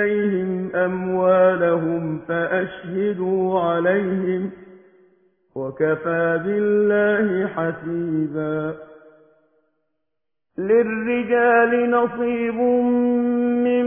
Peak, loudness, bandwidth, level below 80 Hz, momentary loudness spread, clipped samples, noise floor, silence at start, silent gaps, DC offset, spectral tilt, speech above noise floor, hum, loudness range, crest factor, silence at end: -6 dBFS; -20 LUFS; 3.6 kHz; -60 dBFS; 10 LU; under 0.1%; -83 dBFS; 0 s; none; under 0.1%; -11.5 dB/octave; 63 dB; none; 6 LU; 16 dB; 0 s